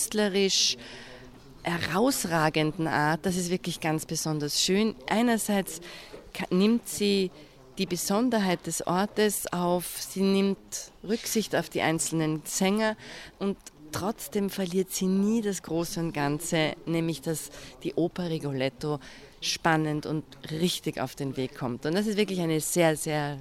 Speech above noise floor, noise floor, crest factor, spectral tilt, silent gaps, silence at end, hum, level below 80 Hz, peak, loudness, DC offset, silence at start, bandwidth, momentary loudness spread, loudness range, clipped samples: 20 dB; -48 dBFS; 18 dB; -4 dB/octave; none; 0 s; none; -58 dBFS; -10 dBFS; -28 LUFS; under 0.1%; 0 s; 16 kHz; 10 LU; 3 LU; under 0.1%